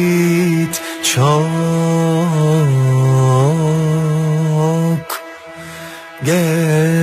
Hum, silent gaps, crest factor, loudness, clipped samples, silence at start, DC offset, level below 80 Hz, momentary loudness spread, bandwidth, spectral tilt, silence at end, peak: none; none; 12 dB; -14 LUFS; under 0.1%; 0 s; under 0.1%; -52 dBFS; 15 LU; 15 kHz; -6 dB/octave; 0 s; -2 dBFS